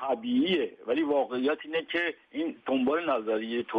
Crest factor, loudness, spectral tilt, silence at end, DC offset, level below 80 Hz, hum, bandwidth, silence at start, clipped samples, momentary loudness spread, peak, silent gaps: 12 dB; -29 LUFS; -7 dB/octave; 0 s; under 0.1%; -72 dBFS; none; 5 kHz; 0 s; under 0.1%; 6 LU; -16 dBFS; none